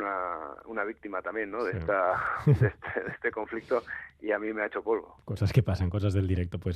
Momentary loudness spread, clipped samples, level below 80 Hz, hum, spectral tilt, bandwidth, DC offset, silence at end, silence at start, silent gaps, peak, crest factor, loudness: 10 LU; under 0.1%; -54 dBFS; none; -8.5 dB/octave; 13 kHz; under 0.1%; 0 s; 0 s; none; -10 dBFS; 20 dB; -30 LUFS